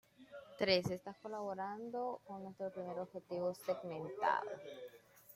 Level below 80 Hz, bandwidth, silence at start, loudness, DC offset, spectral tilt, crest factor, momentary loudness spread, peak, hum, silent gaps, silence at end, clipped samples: -76 dBFS; 16.5 kHz; 0.2 s; -41 LUFS; under 0.1%; -5 dB/octave; 22 dB; 18 LU; -20 dBFS; none; none; 0 s; under 0.1%